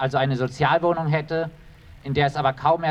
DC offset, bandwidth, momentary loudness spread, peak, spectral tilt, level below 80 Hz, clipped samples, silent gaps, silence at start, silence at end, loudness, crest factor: under 0.1%; 8.8 kHz; 7 LU; -6 dBFS; -7 dB/octave; -50 dBFS; under 0.1%; none; 0 s; 0 s; -22 LUFS; 16 dB